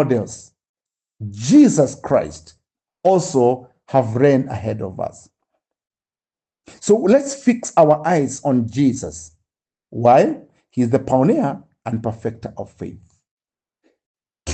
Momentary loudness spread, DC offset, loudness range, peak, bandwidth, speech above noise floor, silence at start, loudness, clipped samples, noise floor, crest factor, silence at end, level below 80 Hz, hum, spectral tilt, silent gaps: 18 LU; under 0.1%; 5 LU; -2 dBFS; 9 kHz; over 73 dB; 0 s; -17 LUFS; under 0.1%; under -90 dBFS; 18 dB; 0 s; -56 dBFS; none; -6.5 dB/octave; 0.69-0.74 s, 13.31-13.37 s, 14.06-14.15 s